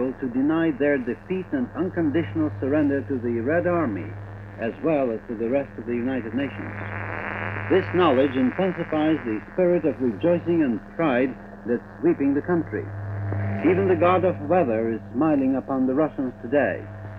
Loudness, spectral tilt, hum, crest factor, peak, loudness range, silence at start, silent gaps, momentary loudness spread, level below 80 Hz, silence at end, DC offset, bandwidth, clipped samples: -24 LUFS; -9.5 dB/octave; none; 16 dB; -6 dBFS; 4 LU; 0 s; none; 10 LU; -52 dBFS; 0 s; under 0.1%; 5 kHz; under 0.1%